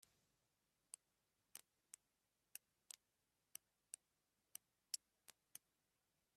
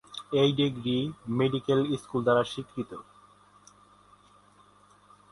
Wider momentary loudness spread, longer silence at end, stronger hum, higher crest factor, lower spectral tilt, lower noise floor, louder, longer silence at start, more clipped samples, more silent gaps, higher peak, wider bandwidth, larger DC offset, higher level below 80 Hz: about the same, 13 LU vs 13 LU; second, 0.8 s vs 2.3 s; second, none vs 50 Hz at -60 dBFS; first, 34 dB vs 18 dB; second, 2.5 dB/octave vs -6.5 dB/octave; first, -89 dBFS vs -59 dBFS; second, -59 LUFS vs -28 LUFS; first, 1.55 s vs 0.1 s; neither; neither; second, -30 dBFS vs -12 dBFS; first, 14.5 kHz vs 11.5 kHz; neither; second, under -90 dBFS vs -64 dBFS